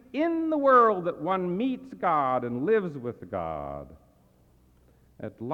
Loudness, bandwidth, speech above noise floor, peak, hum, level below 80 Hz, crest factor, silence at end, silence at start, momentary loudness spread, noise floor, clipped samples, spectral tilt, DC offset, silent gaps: -26 LUFS; 6.6 kHz; 35 dB; -8 dBFS; none; -60 dBFS; 20 dB; 0 s; 0.15 s; 19 LU; -61 dBFS; under 0.1%; -8.5 dB/octave; under 0.1%; none